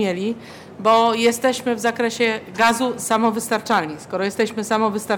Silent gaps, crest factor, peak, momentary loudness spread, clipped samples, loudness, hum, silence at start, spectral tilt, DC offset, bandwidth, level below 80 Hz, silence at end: none; 14 dB; -6 dBFS; 8 LU; under 0.1%; -20 LUFS; none; 0 s; -3.5 dB/octave; under 0.1%; 18 kHz; -66 dBFS; 0 s